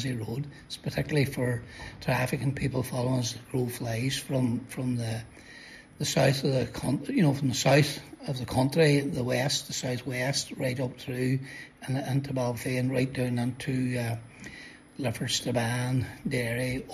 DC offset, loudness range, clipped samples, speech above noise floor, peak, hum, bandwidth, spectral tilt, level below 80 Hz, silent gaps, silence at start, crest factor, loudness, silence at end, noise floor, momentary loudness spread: under 0.1%; 5 LU; under 0.1%; 20 dB; -10 dBFS; none; 14 kHz; -5 dB/octave; -54 dBFS; none; 0 s; 18 dB; -29 LUFS; 0 s; -49 dBFS; 13 LU